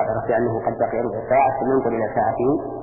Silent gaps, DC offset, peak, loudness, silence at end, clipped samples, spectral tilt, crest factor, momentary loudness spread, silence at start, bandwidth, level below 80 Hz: none; under 0.1%; -6 dBFS; -21 LUFS; 0 s; under 0.1%; -13 dB/octave; 14 dB; 4 LU; 0 s; 2.9 kHz; -48 dBFS